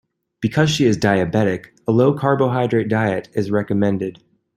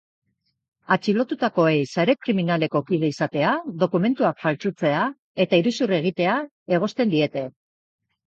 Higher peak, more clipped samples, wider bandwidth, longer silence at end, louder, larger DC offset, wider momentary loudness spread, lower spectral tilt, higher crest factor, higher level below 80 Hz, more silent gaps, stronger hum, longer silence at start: about the same, -2 dBFS vs -4 dBFS; neither; first, 14 kHz vs 8 kHz; second, 0.45 s vs 0.8 s; first, -18 LUFS vs -22 LUFS; neither; about the same, 7 LU vs 5 LU; about the same, -6.5 dB/octave vs -6.5 dB/octave; about the same, 16 dB vs 18 dB; first, -54 dBFS vs -68 dBFS; second, none vs 5.19-5.35 s, 6.51-6.66 s; neither; second, 0.4 s vs 0.9 s